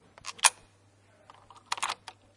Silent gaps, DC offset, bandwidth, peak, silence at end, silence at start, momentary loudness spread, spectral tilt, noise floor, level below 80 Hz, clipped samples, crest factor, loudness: none; under 0.1%; 11.5 kHz; -4 dBFS; 0.4 s; 0.25 s; 16 LU; 2.5 dB/octave; -62 dBFS; -72 dBFS; under 0.1%; 32 dB; -28 LUFS